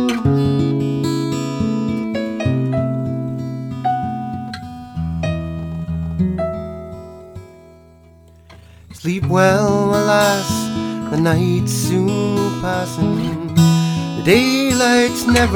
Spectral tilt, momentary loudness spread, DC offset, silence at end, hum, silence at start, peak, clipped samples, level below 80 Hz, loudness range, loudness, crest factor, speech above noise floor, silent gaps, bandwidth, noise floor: -5.5 dB/octave; 13 LU; under 0.1%; 0 s; none; 0 s; 0 dBFS; under 0.1%; -38 dBFS; 9 LU; -18 LUFS; 18 dB; 30 dB; none; 18.5 kHz; -45 dBFS